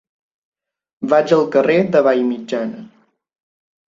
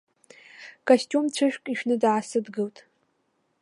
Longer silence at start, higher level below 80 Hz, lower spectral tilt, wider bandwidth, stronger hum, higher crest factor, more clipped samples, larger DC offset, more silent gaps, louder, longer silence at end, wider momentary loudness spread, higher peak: first, 1 s vs 0.6 s; first, -64 dBFS vs -84 dBFS; first, -7 dB/octave vs -4.5 dB/octave; second, 7.6 kHz vs 11.5 kHz; neither; about the same, 18 dB vs 20 dB; neither; neither; neither; first, -16 LUFS vs -25 LUFS; about the same, 1 s vs 0.9 s; about the same, 14 LU vs 13 LU; first, -2 dBFS vs -6 dBFS